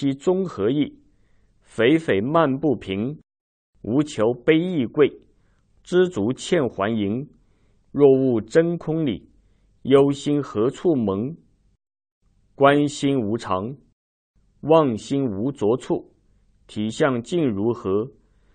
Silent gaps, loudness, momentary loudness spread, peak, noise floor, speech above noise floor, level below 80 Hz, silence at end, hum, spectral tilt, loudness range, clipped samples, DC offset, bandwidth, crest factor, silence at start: 3.40-3.73 s, 12.12-12.21 s, 13.93-14.34 s; -21 LUFS; 12 LU; -2 dBFS; -60 dBFS; 39 dB; -58 dBFS; 0.45 s; none; -6.5 dB/octave; 3 LU; under 0.1%; under 0.1%; 9.4 kHz; 20 dB; 0 s